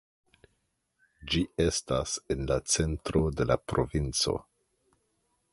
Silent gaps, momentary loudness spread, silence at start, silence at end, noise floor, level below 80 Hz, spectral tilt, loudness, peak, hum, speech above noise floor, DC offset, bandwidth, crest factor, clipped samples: none; 5 LU; 1.2 s; 1.1 s; -77 dBFS; -42 dBFS; -4.5 dB/octave; -29 LUFS; -10 dBFS; none; 48 dB; under 0.1%; 11.5 kHz; 22 dB; under 0.1%